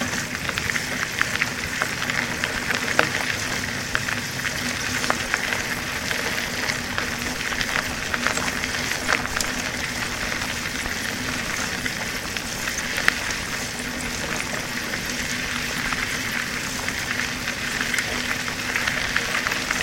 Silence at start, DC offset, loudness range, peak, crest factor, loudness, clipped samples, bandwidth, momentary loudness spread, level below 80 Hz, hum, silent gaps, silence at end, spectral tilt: 0 s; 0.1%; 2 LU; 0 dBFS; 26 dB; -24 LUFS; under 0.1%; 16.5 kHz; 4 LU; -44 dBFS; none; none; 0 s; -2 dB/octave